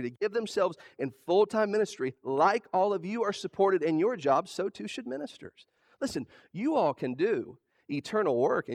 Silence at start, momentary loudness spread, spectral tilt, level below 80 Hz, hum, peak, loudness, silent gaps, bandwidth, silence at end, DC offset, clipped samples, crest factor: 0 s; 12 LU; -5.5 dB/octave; -74 dBFS; none; -10 dBFS; -30 LUFS; none; 12.5 kHz; 0 s; under 0.1%; under 0.1%; 18 dB